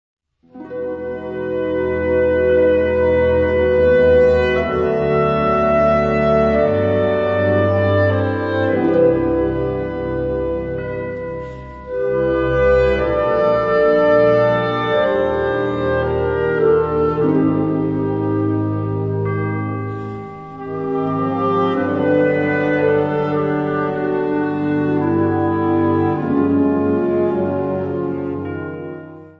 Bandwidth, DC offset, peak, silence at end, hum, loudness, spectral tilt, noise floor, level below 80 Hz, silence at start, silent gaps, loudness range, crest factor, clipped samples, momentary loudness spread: 6.4 kHz; under 0.1%; -4 dBFS; 0.1 s; none; -17 LUFS; -9.5 dB/octave; -38 dBFS; -36 dBFS; 0.55 s; none; 5 LU; 14 dB; under 0.1%; 11 LU